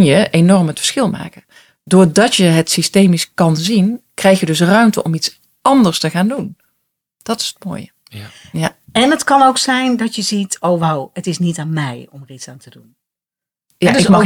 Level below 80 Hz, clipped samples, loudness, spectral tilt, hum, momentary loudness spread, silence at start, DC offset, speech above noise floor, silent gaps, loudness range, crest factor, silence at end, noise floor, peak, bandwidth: -52 dBFS; under 0.1%; -14 LUFS; -5 dB/octave; none; 19 LU; 0 s; under 0.1%; 74 dB; none; 7 LU; 14 dB; 0 s; -88 dBFS; 0 dBFS; 16.5 kHz